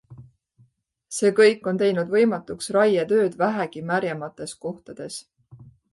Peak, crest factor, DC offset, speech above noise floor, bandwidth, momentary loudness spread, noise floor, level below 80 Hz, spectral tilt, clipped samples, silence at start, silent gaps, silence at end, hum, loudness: -6 dBFS; 18 dB; under 0.1%; 40 dB; 11.5 kHz; 17 LU; -62 dBFS; -66 dBFS; -5 dB/octave; under 0.1%; 0.1 s; none; 0.3 s; none; -22 LUFS